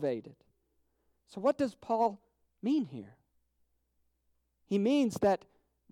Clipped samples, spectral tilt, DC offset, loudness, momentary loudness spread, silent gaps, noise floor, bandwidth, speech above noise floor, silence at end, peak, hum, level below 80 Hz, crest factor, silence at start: under 0.1%; -6.5 dB/octave; under 0.1%; -32 LUFS; 13 LU; none; -77 dBFS; 15.5 kHz; 46 dB; 0.55 s; -16 dBFS; none; -72 dBFS; 18 dB; 0 s